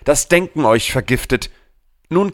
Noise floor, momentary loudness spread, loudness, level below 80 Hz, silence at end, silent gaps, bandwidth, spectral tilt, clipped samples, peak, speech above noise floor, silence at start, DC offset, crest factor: -55 dBFS; 7 LU; -16 LUFS; -34 dBFS; 0 s; none; 17.5 kHz; -4 dB/octave; under 0.1%; -2 dBFS; 39 dB; 0.05 s; under 0.1%; 16 dB